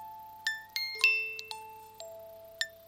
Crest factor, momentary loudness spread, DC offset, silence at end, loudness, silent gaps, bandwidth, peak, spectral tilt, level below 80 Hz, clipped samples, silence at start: 28 dB; 23 LU; under 0.1%; 0 s; -31 LUFS; none; 16.5 kHz; -8 dBFS; 1.5 dB/octave; -76 dBFS; under 0.1%; 0 s